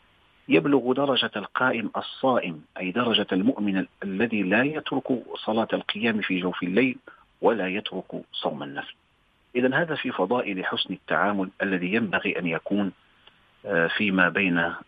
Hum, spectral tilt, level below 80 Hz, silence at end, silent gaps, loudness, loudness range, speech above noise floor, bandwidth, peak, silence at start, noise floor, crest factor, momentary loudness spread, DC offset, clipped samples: none; -8 dB/octave; -66 dBFS; 0.05 s; none; -25 LUFS; 3 LU; 39 dB; 5 kHz; -4 dBFS; 0.5 s; -64 dBFS; 20 dB; 9 LU; under 0.1%; under 0.1%